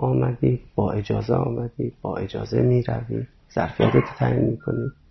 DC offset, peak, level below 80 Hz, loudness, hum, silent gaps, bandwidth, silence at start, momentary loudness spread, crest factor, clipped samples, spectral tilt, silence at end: under 0.1%; -4 dBFS; -44 dBFS; -24 LUFS; none; none; 6.2 kHz; 0 s; 10 LU; 18 dB; under 0.1%; -9.5 dB/octave; 0.2 s